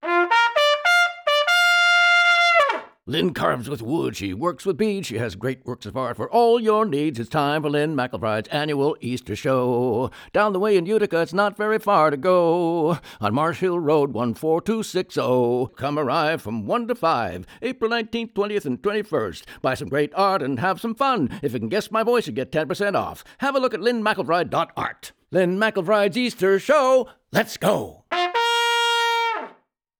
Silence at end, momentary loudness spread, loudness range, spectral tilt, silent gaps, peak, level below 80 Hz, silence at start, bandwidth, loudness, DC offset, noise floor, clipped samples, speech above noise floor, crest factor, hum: 0.5 s; 10 LU; 6 LU; -5 dB/octave; none; -6 dBFS; -60 dBFS; 0 s; over 20 kHz; -21 LUFS; under 0.1%; -56 dBFS; under 0.1%; 34 dB; 16 dB; none